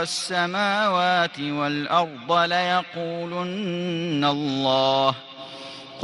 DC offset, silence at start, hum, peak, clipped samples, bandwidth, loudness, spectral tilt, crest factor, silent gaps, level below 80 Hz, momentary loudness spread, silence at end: under 0.1%; 0 s; none; -6 dBFS; under 0.1%; 12 kHz; -23 LUFS; -4.5 dB/octave; 18 dB; none; -68 dBFS; 12 LU; 0 s